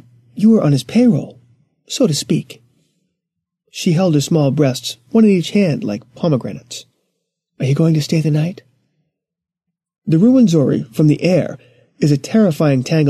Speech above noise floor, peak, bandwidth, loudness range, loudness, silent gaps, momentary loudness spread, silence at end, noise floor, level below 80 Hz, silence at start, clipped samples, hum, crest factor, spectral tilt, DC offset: 70 dB; -2 dBFS; 13.5 kHz; 5 LU; -15 LUFS; none; 14 LU; 0 s; -84 dBFS; -58 dBFS; 0.35 s; under 0.1%; none; 14 dB; -6.5 dB/octave; under 0.1%